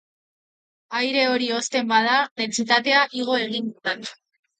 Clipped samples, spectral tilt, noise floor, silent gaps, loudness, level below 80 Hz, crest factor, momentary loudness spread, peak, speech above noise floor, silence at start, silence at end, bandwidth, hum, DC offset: under 0.1%; -2 dB/octave; under -90 dBFS; 2.31-2.36 s; -21 LUFS; -76 dBFS; 22 dB; 10 LU; -2 dBFS; over 68 dB; 0.9 s; 0.45 s; 9.4 kHz; none; under 0.1%